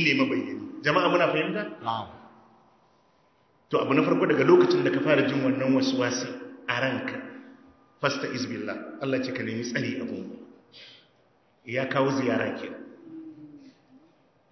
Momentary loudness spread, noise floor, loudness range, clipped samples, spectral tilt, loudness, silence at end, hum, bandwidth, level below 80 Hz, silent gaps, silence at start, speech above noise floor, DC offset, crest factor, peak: 21 LU; -64 dBFS; 8 LU; under 0.1%; -5.5 dB/octave; -26 LUFS; 0.85 s; none; 6.4 kHz; -70 dBFS; none; 0 s; 39 dB; under 0.1%; 20 dB; -6 dBFS